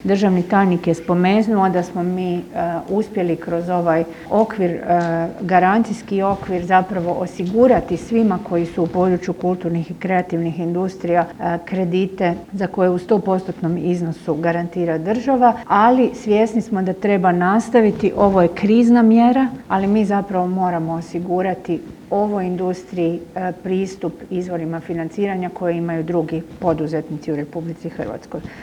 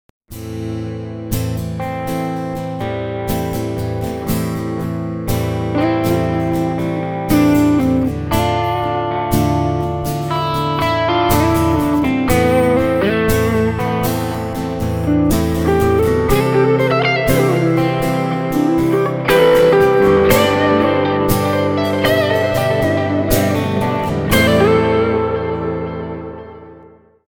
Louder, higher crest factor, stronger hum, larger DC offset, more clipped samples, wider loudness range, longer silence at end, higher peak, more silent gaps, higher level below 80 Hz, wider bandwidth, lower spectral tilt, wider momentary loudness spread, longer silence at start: second, -19 LUFS vs -16 LUFS; about the same, 18 dB vs 16 dB; neither; neither; neither; about the same, 8 LU vs 8 LU; second, 0 s vs 0.5 s; about the same, 0 dBFS vs 0 dBFS; neither; second, -50 dBFS vs -32 dBFS; second, 11 kHz vs 19.5 kHz; first, -8 dB/octave vs -6 dB/octave; about the same, 10 LU vs 10 LU; second, 0 s vs 0.3 s